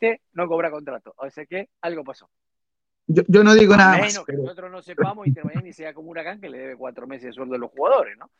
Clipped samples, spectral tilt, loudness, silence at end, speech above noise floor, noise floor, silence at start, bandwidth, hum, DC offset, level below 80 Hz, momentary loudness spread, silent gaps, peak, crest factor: under 0.1%; -5.5 dB/octave; -18 LUFS; 0.25 s; 67 dB; -87 dBFS; 0 s; 8 kHz; none; under 0.1%; -56 dBFS; 24 LU; none; 0 dBFS; 20 dB